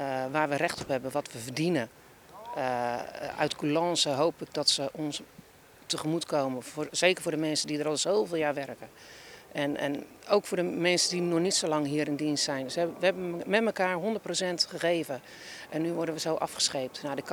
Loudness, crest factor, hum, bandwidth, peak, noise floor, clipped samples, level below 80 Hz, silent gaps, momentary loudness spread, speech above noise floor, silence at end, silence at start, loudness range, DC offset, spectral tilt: -29 LUFS; 22 dB; none; over 20 kHz; -8 dBFS; -54 dBFS; under 0.1%; -70 dBFS; none; 12 LU; 25 dB; 0 s; 0 s; 3 LU; under 0.1%; -3.5 dB/octave